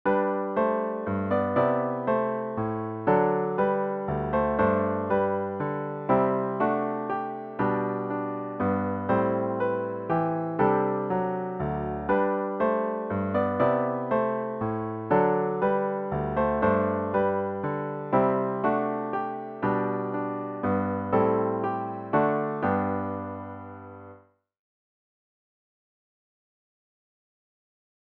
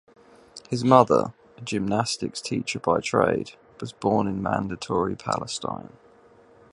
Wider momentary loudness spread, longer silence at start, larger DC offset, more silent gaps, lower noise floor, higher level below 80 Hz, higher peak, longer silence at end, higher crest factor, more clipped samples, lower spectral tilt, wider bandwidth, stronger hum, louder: second, 7 LU vs 19 LU; second, 0.05 s vs 0.55 s; neither; neither; about the same, -54 dBFS vs -54 dBFS; about the same, -54 dBFS vs -56 dBFS; second, -8 dBFS vs 0 dBFS; first, 3.9 s vs 0.85 s; second, 18 dB vs 24 dB; neither; first, -11 dB/octave vs -5.5 dB/octave; second, 4.5 kHz vs 11.5 kHz; neither; second, -27 LUFS vs -24 LUFS